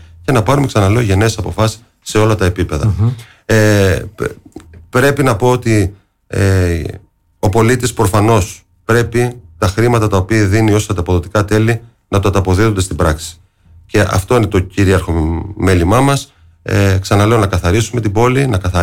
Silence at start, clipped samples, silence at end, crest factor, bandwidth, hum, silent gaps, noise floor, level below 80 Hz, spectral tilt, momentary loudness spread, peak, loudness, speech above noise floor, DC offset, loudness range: 0 s; under 0.1%; 0 s; 10 dB; 16.5 kHz; none; none; -44 dBFS; -30 dBFS; -6 dB/octave; 8 LU; -2 dBFS; -13 LUFS; 32 dB; 0.6%; 2 LU